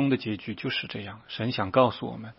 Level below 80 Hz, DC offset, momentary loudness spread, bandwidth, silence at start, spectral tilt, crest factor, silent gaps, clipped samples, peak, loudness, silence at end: -64 dBFS; under 0.1%; 13 LU; 5.8 kHz; 0 s; -10 dB/octave; 22 dB; none; under 0.1%; -6 dBFS; -28 LUFS; 0.05 s